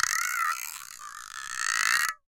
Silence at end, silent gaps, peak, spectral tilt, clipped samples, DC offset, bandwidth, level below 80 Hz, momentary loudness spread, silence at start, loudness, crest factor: 0.15 s; none; -6 dBFS; 4 dB/octave; under 0.1%; under 0.1%; 17 kHz; -68 dBFS; 16 LU; 0 s; -27 LUFS; 24 dB